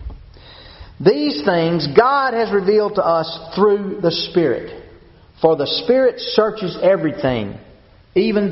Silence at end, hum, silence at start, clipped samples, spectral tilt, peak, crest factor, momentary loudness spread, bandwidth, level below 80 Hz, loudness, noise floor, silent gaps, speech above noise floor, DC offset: 0 s; none; 0 s; under 0.1%; -4 dB/octave; 0 dBFS; 18 dB; 6 LU; 6 kHz; -44 dBFS; -17 LUFS; -46 dBFS; none; 30 dB; under 0.1%